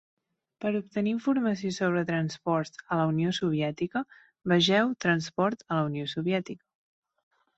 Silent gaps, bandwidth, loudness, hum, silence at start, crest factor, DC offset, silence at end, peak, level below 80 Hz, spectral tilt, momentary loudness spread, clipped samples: none; 8.2 kHz; -28 LUFS; none; 0.6 s; 18 dB; under 0.1%; 1 s; -10 dBFS; -68 dBFS; -6 dB/octave; 8 LU; under 0.1%